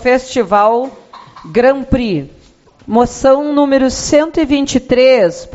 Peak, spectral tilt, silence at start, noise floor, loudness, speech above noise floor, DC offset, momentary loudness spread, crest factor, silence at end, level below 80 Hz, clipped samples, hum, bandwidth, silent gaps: 0 dBFS; -4.5 dB/octave; 0 s; -45 dBFS; -12 LUFS; 33 dB; under 0.1%; 8 LU; 12 dB; 0.05 s; -36 dBFS; under 0.1%; none; 8.2 kHz; none